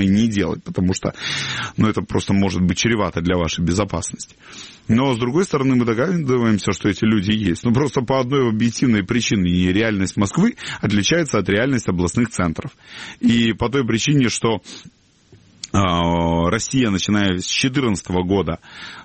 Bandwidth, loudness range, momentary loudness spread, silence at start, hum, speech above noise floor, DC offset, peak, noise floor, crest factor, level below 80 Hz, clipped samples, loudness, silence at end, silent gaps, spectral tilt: 8.8 kHz; 2 LU; 7 LU; 0 s; none; 32 dB; 0.1%; -4 dBFS; -51 dBFS; 14 dB; -42 dBFS; under 0.1%; -19 LUFS; 0 s; none; -5 dB/octave